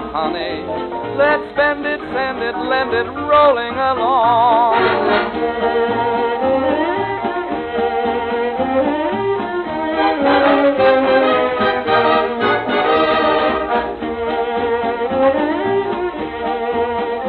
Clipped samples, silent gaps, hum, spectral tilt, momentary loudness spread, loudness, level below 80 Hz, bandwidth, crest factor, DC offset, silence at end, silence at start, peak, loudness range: under 0.1%; none; none; -7.5 dB/octave; 8 LU; -16 LUFS; -46 dBFS; 5 kHz; 14 dB; under 0.1%; 0 s; 0 s; -2 dBFS; 4 LU